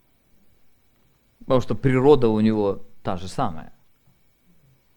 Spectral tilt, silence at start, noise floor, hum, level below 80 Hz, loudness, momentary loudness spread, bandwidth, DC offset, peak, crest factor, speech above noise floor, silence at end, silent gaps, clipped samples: -8 dB/octave; 1.45 s; -61 dBFS; none; -44 dBFS; -21 LUFS; 15 LU; 19 kHz; under 0.1%; -2 dBFS; 22 dB; 42 dB; 1.25 s; none; under 0.1%